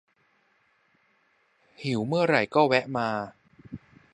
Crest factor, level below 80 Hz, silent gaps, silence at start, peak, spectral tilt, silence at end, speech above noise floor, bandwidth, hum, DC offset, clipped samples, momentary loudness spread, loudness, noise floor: 24 dB; -66 dBFS; none; 1.8 s; -6 dBFS; -6.5 dB/octave; 0.35 s; 43 dB; 11 kHz; none; under 0.1%; under 0.1%; 23 LU; -25 LUFS; -68 dBFS